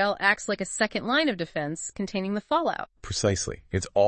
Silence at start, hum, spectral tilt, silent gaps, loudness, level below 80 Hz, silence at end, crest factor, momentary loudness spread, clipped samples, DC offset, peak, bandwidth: 0 s; none; -4 dB/octave; none; -27 LUFS; -52 dBFS; 0 s; 20 dB; 8 LU; under 0.1%; under 0.1%; -8 dBFS; 8.8 kHz